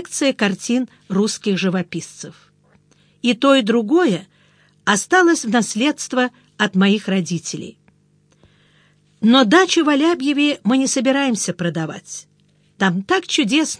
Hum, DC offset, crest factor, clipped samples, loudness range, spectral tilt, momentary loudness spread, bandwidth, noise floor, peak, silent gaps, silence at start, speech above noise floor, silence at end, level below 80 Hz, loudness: 50 Hz at -45 dBFS; under 0.1%; 18 dB; under 0.1%; 5 LU; -4 dB/octave; 14 LU; 10.5 kHz; -57 dBFS; 0 dBFS; none; 0 s; 40 dB; 0.05 s; -66 dBFS; -17 LUFS